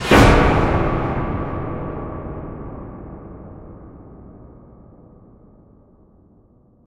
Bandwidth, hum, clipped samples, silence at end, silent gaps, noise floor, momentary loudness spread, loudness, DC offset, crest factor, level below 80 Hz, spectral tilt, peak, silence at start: 16 kHz; none; under 0.1%; 2.45 s; none; -53 dBFS; 28 LU; -19 LUFS; under 0.1%; 22 dB; -28 dBFS; -6 dB/octave; 0 dBFS; 0 s